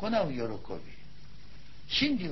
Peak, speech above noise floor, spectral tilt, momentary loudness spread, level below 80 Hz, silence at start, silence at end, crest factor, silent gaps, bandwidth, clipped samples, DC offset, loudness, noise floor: -16 dBFS; 21 dB; -5 dB/octave; 26 LU; -54 dBFS; 0 s; 0 s; 18 dB; none; 6.2 kHz; under 0.1%; 1%; -31 LUFS; -53 dBFS